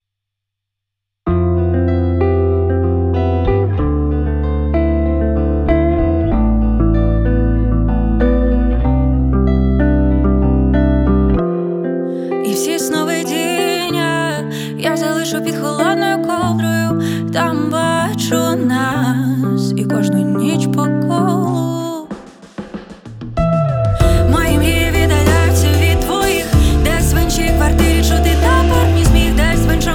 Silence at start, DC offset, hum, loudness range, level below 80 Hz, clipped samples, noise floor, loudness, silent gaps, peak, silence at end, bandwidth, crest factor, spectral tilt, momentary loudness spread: 1.25 s; under 0.1%; none; 4 LU; -20 dBFS; under 0.1%; -79 dBFS; -15 LUFS; none; 0 dBFS; 0 s; 17.5 kHz; 14 dB; -6 dB/octave; 6 LU